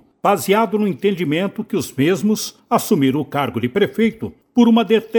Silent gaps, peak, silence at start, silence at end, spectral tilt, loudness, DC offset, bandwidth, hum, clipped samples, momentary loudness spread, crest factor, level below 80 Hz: none; -2 dBFS; 0.25 s; 0 s; -5.5 dB/octave; -18 LUFS; under 0.1%; 19.5 kHz; none; under 0.1%; 8 LU; 16 dB; -58 dBFS